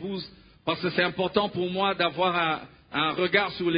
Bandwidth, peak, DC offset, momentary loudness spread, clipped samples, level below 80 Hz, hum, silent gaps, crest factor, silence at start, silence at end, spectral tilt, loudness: 5.2 kHz; -6 dBFS; under 0.1%; 11 LU; under 0.1%; -60 dBFS; none; none; 20 dB; 0 s; 0 s; -9.5 dB/octave; -26 LUFS